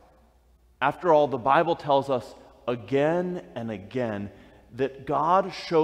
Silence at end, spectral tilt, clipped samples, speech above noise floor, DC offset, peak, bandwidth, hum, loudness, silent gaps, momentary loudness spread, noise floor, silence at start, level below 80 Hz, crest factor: 0 s; -7 dB/octave; under 0.1%; 35 dB; under 0.1%; -8 dBFS; 11.5 kHz; none; -26 LUFS; none; 14 LU; -60 dBFS; 0.8 s; -60 dBFS; 18 dB